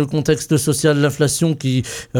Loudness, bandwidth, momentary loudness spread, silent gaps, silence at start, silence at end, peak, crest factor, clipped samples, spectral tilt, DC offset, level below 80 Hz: -17 LUFS; 17.5 kHz; 4 LU; none; 0 s; 0 s; -4 dBFS; 14 dB; under 0.1%; -5 dB/octave; under 0.1%; -46 dBFS